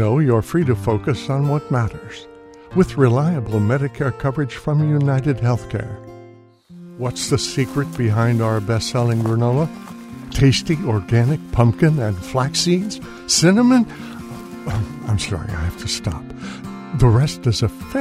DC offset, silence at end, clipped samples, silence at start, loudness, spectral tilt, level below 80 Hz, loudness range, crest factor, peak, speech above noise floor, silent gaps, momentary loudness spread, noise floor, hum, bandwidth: under 0.1%; 0 s; under 0.1%; 0 s; -19 LUFS; -6 dB/octave; -38 dBFS; 4 LU; 18 dB; 0 dBFS; 27 dB; none; 16 LU; -44 dBFS; none; 15 kHz